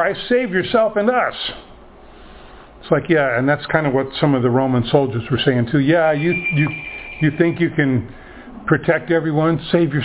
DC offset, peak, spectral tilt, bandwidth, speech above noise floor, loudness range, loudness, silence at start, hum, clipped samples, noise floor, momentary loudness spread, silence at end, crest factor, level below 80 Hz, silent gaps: under 0.1%; 0 dBFS; -10.5 dB/octave; 4 kHz; 25 dB; 3 LU; -18 LUFS; 0 s; none; under 0.1%; -41 dBFS; 8 LU; 0 s; 18 dB; -46 dBFS; none